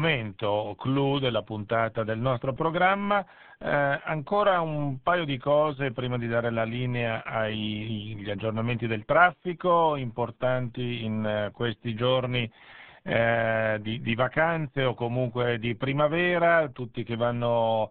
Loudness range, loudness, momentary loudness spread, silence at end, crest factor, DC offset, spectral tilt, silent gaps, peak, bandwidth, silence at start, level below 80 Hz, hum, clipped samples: 3 LU; -27 LUFS; 8 LU; 0 s; 20 dB; 0.2%; -4.5 dB/octave; none; -6 dBFS; 4.4 kHz; 0 s; -56 dBFS; none; under 0.1%